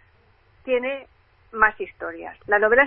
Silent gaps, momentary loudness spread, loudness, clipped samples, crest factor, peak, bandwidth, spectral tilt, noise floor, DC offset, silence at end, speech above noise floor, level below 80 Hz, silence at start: none; 17 LU; -23 LUFS; under 0.1%; 20 dB; -2 dBFS; 3.8 kHz; -8 dB/octave; -58 dBFS; under 0.1%; 0 s; 37 dB; -52 dBFS; 0.65 s